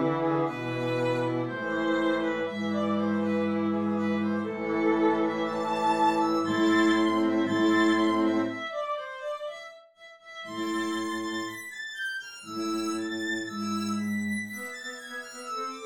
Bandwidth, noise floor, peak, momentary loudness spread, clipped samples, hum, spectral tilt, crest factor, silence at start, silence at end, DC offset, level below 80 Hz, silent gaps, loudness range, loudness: 14 kHz; -52 dBFS; -14 dBFS; 13 LU; under 0.1%; none; -5.5 dB/octave; 14 dB; 0 s; 0 s; under 0.1%; -74 dBFS; none; 9 LU; -28 LUFS